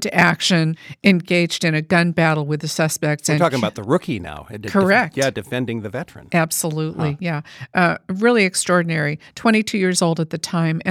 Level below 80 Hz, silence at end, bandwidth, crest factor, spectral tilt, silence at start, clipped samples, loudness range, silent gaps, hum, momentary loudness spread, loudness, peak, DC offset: -56 dBFS; 0 s; 16 kHz; 18 dB; -4.5 dB/octave; 0 s; under 0.1%; 3 LU; none; none; 9 LU; -19 LUFS; 0 dBFS; under 0.1%